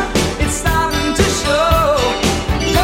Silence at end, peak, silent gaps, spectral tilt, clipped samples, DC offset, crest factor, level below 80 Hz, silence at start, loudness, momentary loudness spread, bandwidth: 0 s; 0 dBFS; none; -4 dB/octave; under 0.1%; under 0.1%; 14 dB; -24 dBFS; 0 s; -15 LUFS; 4 LU; 17 kHz